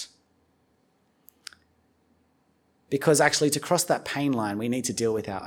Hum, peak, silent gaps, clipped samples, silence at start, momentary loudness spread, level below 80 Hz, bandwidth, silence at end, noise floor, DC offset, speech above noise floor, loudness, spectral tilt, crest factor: none; -6 dBFS; none; under 0.1%; 0 s; 25 LU; -66 dBFS; 19.5 kHz; 0 s; -68 dBFS; under 0.1%; 43 dB; -25 LUFS; -3.5 dB/octave; 22 dB